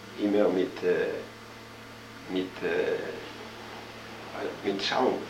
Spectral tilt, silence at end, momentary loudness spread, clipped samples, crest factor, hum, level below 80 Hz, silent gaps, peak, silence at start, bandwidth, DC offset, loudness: -5 dB/octave; 0 s; 19 LU; under 0.1%; 20 dB; none; -64 dBFS; none; -12 dBFS; 0 s; 16 kHz; under 0.1%; -29 LUFS